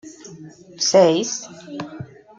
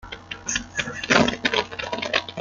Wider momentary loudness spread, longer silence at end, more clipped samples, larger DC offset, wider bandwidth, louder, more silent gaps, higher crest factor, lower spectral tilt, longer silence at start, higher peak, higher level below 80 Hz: first, 25 LU vs 10 LU; first, 0.35 s vs 0 s; neither; neither; second, 8.6 kHz vs 9.6 kHz; first, -18 LUFS vs -23 LUFS; neither; about the same, 20 dB vs 22 dB; about the same, -3.5 dB/octave vs -2.5 dB/octave; about the same, 0.05 s vs 0.05 s; about the same, -2 dBFS vs -2 dBFS; second, -66 dBFS vs -50 dBFS